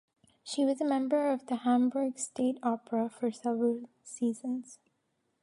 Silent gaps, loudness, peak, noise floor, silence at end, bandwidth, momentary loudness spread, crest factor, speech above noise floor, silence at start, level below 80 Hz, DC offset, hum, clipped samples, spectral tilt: none; -32 LUFS; -16 dBFS; -78 dBFS; 0.65 s; 11.5 kHz; 11 LU; 16 dB; 47 dB; 0.45 s; -84 dBFS; under 0.1%; none; under 0.1%; -4.5 dB/octave